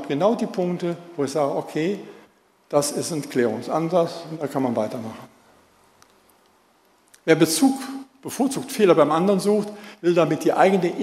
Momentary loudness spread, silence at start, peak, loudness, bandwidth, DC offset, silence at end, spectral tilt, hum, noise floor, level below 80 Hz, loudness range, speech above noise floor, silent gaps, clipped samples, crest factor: 13 LU; 0 s; -2 dBFS; -22 LUFS; 16 kHz; under 0.1%; 0 s; -5 dB/octave; none; -60 dBFS; -70 dBFS; 7 LU; 38 dB; none; under 0.1%; 20 dB